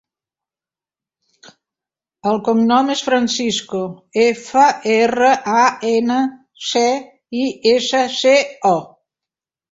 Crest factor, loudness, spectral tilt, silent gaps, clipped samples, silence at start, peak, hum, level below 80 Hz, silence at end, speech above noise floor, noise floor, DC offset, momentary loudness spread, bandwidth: 18 dB; -16 LUFS; -3.5 dB/octave; none; under 0.1%; 2.25 s; 0 dBFS; none; -62 dBFS; 0.85 s; over 74 dB; under -90 dBFS; under 0.1%; 9 LU; 8 kHz